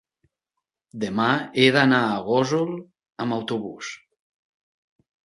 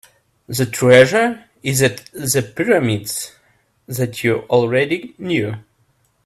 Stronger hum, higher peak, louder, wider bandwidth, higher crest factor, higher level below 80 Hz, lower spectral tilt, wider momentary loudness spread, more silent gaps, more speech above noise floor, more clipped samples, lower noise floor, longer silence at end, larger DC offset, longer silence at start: neither; about the same, -2 dBFS vs 0 dBFS; second, -22 LUFS vs -17 LUFS; second, 11.5 kHz vs 16 kHz; about the same, 22 dB vs 18 dB; second, -66 dBFS vs -54 dBFS; about the same, -5.5 dB/octave vs -4.5 dB/octave; first, 18 LU vs 15 LU; neither; first, 62 dB vs 45 dB; neither; first, -84 dBFS vs -61 dBFS; first, 1.35 s vs 0.65 s; neither; first, 0.95 s vs 0.5 s